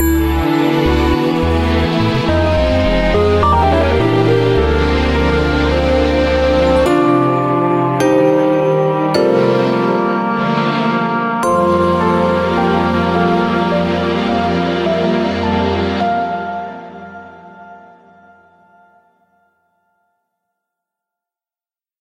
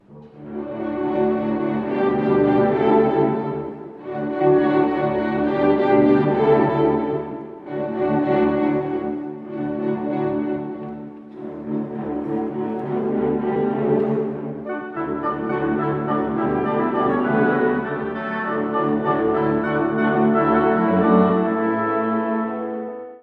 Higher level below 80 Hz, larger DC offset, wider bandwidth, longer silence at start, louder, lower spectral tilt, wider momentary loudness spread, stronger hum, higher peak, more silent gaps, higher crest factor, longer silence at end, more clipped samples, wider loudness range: first, -26 dBFS vs -52 dBFS; neither; first, 15.5 kHz vs 5 kHz; about the same, 0 s vs 0.1 s; first, -14 LUFS vs -21 LUFS; second, -7 dB/octave vs -10 dB/octave; second, 4 LU vs 12 LU; neither; about the same, -2 dBFS vs -4 dBFS; neither; about the same, 14 dB vs 18 dB; first, 4.2 s vs 0.05 s; neither; about the same, 6 LU vs 7 LU